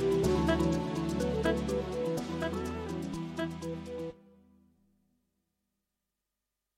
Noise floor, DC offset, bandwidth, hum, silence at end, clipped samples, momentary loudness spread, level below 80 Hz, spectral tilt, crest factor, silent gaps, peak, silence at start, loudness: -88 dBFS; under 0.1%; 16 kHz; 50 Hz at -70 dBFS; 2.6 s; under 0.1%; 11 LU; -48 dBFS; -6.5 dB/octave; 18 dB; none; -16 dBFS; 0 s; -33 LUFS